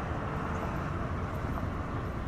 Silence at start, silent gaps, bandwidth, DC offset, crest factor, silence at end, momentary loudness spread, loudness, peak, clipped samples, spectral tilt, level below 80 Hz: 0 s; none; 13 kHz; under 0.1%; 14 dB; 0 s; 1 LU; -35 LUFS; -20 dBFS; under 0.1%; -7.5 dB/octave; -40 dBFS